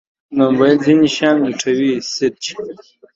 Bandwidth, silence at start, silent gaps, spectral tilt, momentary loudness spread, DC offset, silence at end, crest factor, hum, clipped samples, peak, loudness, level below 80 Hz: 7.8 kHz; 0.3 s; none; -5 dB/octave; 13 LU; under 0.1%; 0.4 s; 16 dB; none; under 0.1%; 0 dBFS; -15 LUFS; -58 dBFS